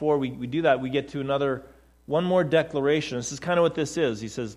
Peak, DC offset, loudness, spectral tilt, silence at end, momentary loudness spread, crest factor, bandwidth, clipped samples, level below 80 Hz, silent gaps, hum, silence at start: -8 dBFS; under 0.1%; -25 LUFS; -5.5 dB/octave; 0 s; 6 LU; 18 dB; 12 kHz; under 0.1%; -56 dBFS; none; none; 0 s